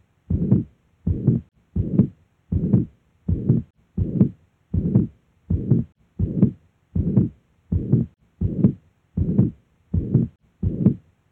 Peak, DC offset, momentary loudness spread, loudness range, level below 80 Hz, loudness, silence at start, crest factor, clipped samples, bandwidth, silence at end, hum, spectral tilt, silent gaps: -4 dBFS; under 0.1%; 10 LU; 1 LU; -36 dBFS; -23 LUFS; 0.3 s; 18 dB; under 0.1%; 2.6 kHz; 0.3 s; none; -14 dB/octave; none